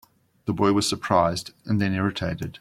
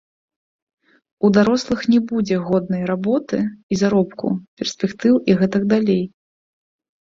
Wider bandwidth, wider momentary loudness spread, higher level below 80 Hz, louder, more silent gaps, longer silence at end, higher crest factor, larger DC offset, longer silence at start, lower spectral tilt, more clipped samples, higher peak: first, 15.5 kHz vs 7.6 kHz; about the same, 10 LU vs 8 LU; about the same, -54 dBFS vs -56 dBFS; second, -24 LUFS vs -19 LUFS; second, none vs 3.63-3.69 s, 4.48-4.57 s; second, 0.05 s vs 0.95 s; about the same, 20 dB vs 16 dB; neither; second, 0.45 s vs 1.2 s; second, -5 dB/octave vs -6.5 dB/octave; neither; second, -6 dBFS vs -2 dBFS